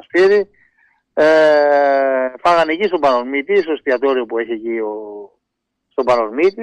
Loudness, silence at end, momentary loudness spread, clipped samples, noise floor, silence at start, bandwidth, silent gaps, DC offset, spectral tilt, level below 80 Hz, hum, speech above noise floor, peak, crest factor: -15 LUFS; 0 s; 14 LU; under 0.1%; -76 dBFS; 0.15 s; 9.4 kHz; none; under 0.1%; -5 dB/octave; -58 dBFS; none; 61 dB; -4 dBFS; 12 dB